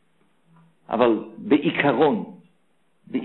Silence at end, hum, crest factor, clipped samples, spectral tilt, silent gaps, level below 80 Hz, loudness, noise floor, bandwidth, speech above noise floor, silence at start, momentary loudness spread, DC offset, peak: 0 s; none; 18 dB; under 0.1%; -9.5 dB/octave; none; -62 dBFS; -22 LUFS; -68 dBFS; 4.2 kHz; 48 dB; 0.9 s; 11 LU; under 0.1%; -6 dBFS